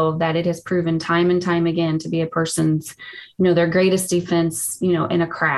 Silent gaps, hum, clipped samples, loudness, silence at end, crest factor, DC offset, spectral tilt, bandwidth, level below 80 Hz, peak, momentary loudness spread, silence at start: none; none; under 0.1%; -20 LUFS; 0 s; 14 dB; under 0.1%; -5.5 dB/octave; 13 kHz; -54 dBFS; -6 dBFS; 5 LU; 0 s